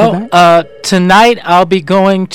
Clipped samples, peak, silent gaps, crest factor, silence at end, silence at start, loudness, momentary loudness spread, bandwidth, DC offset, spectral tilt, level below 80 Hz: under 0.1%; 0 dBFS; none; 8 dB; 0 s; 0 s; -8 LUFS; 5 LU; 17 kHz; under 0.1%; -5 dB/octave; -42 dBFS